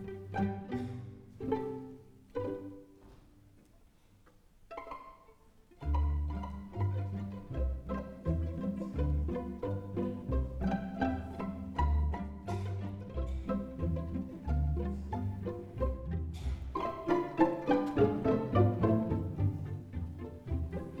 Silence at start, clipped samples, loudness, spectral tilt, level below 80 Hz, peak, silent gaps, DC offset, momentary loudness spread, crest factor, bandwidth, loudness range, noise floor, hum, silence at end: 0 s; under 0.1%; -36 LUFS; -9.5 dB/octave; -42 dBFS; -14 dBFS; none; under 0.1%; 13 LU; 22 dB; 7.4 kHz; 12 LU; -62 dBFS; none; 0 s